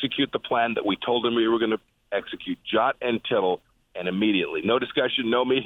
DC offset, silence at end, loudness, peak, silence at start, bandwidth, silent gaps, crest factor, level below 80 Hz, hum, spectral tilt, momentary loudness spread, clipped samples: under 0.1%; 0 s; -25 LUFS; -8 dBFS; 0 s; 4.1 kHz; none; 16 dB; -62 dBFS; none; -7.5 dB/octave; 9 LU; under 0.1%